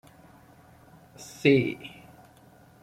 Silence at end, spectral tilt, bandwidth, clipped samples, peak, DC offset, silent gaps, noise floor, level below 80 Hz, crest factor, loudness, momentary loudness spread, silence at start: 0.95 s; -6 dB/octave; 15.5 kHz; under 0.1%; -8 dBFS; under 0.1%; none; -55 dBFS; -66 dBFS; 24 dB; -24 LUFS; 24 LU; 1.2 s